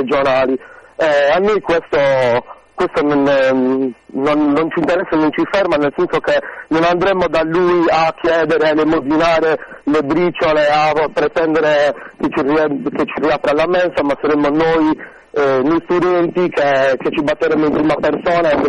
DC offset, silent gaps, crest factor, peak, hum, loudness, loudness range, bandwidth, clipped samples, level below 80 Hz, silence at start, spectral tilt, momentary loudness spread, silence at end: under 0.1%; none; 12 dB; -2 dBFS; none; -15 LUFS; 1 LU; 9.8 kHz; under 0.1%; -44 dBFS; 0 s; -6 dB/octave; 6 LU; 0 s